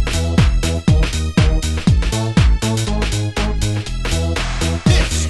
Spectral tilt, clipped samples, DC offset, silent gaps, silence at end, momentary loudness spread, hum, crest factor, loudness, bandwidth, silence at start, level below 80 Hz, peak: -5 dB/octave; under 0.1%; under 0.1%; none; 0 s; 5 LU; none; 16 dB; -17 LUFS; 12.5 kHz; 0 s; -20 dBFS; 0 dBFS